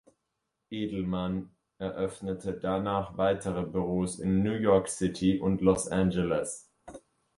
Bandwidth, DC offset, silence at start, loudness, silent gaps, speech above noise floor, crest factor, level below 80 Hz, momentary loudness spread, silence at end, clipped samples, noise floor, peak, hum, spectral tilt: 11.5 kHz; under 0.1%; 0.7 s; -30 LUFS; none; 54 dB; 20 dB; -52 dBFS; 12 LU; 0.4 s; under 0.1%; -82 dBFS; -10 dBFS; none; -6 dB/octave